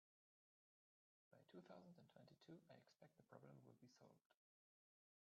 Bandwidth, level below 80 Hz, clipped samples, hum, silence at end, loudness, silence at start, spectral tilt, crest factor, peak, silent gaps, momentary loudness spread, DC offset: 6.8 kHz; under -90 dBFS; under 0.1%; none; 0.95 s; -67 LUFS; 1.3 s; -6 dB/octave; 22 dB; -50 dBFS; 4.26-4.30 s; 4 LU; under 0.1%